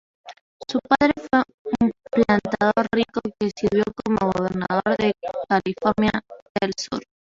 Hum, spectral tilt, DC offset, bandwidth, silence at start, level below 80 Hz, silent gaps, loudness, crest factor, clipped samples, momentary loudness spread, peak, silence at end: none; -6 dB/octave; under 0.1%; 7.6 kHz; 0.25 s; -52 dBFS; 0.41-0.60 s, 1.54-1.65 s, 6.42-6.55 s; -22 LUFS; 20 dB; under 0.1%; 9 LU; -2 dBFS; 0.2 s